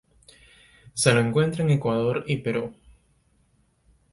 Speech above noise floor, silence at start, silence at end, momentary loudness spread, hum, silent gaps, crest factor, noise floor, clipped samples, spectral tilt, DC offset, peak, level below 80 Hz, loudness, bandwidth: 42 dB; 0.85 s; 1.4 s; 10 LU; none; none; 24 dB; -65 dBFS; under 0.1%; -5.5 dB/octave; under 0.1%; -2 dBFS; -56 dBFS; -23 LUFS; 11.5 kHz